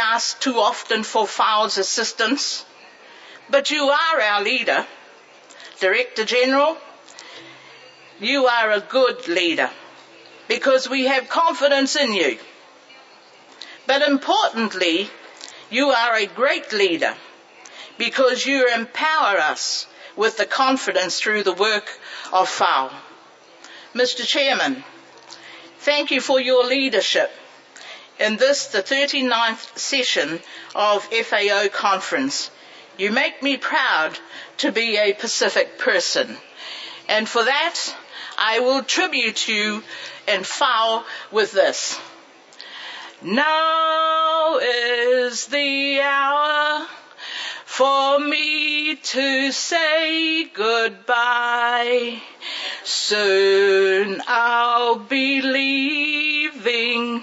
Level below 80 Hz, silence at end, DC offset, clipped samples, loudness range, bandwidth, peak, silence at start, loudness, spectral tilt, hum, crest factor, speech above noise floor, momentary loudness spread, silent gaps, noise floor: -82 dBFS; 0 s; under 0.1%; under 0.1%; 3 LU; 8 kHz; -2 dBFS; 0 s; -19 LUFS; -1.5 dB/octave; none; 18 dB; 28 dB; 13 LU; none; -48 dBFS